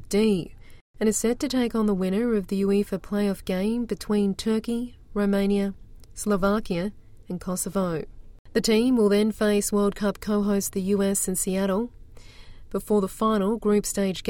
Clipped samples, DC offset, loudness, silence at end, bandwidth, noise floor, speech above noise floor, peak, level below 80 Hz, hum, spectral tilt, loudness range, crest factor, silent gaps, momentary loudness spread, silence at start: under 0.1%; under 0.1%; -25 LUFS; 0 s; 17 kHz; -44 dBFS; 20 dB; -10 dBFS; -46 dBFS; none; -5 dB/octave; 4 LU; 16 dB; 0.81-0.94 s, 8.39-8.45 s; 9 LU; 0 s